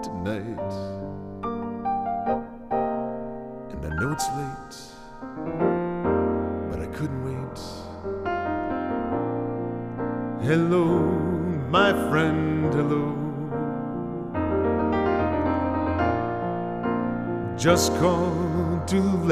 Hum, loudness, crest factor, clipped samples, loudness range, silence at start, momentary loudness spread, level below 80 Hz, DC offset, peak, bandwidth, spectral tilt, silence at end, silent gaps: none; -26 LUFS; 20 dB; under 0.1%; 6 LU; 0 s; 13 LU; -46 dBFS; under 0.1%; -6 dBFS; 15.5 kHz; -6 dB/octave; 0 s; none